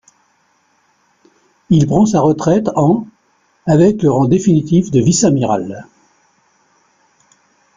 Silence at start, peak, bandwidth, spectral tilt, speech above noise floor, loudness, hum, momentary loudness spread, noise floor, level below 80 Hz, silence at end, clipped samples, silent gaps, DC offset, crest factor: 1.7 s; -2 dBFS; 9.6 kHz; -6.5 dB/octave; 46 dB; -13 LUFS; none; 8 LU; -58 dBFS; -46 dBFS; 1.95 s; under 0.1%; none; under 0.1%; 14 dB